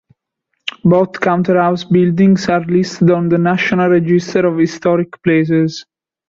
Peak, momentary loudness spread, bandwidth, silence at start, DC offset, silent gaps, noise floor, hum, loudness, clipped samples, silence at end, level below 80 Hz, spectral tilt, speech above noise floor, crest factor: -2 dBFS; 4 LU; 7.6 kHz; 0.65 s; under 0.1%; none; -72 dBFS; none; -13 LUFS; under 0.1%; 0.45 s; -52 dBFS; -7 dB/octave; 59 dB; 12 dB